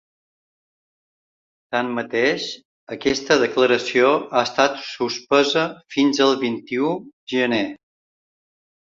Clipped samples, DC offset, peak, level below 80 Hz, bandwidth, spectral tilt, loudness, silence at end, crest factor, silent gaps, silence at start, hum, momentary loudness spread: under 0.1%; under 0.1%; -2 dBFS; -60 dBFS; 7.8 kHz; -4 dB/octave; -20 LUFS; 1.15 s; 20 dB; 2.65-2.87 s, 7.13-7.27 s; 1.7 s; none; 9 LU